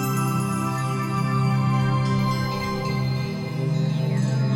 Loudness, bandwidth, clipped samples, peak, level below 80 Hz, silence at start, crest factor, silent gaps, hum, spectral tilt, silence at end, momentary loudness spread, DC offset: -24 LUFS; 16.5 kHz; under 0.1%; -12 dBFS; -48 dBFS; 0 s; 12 dB; none; none; -6.5 dB/octave; 0 s; 4 LU; under 0.1%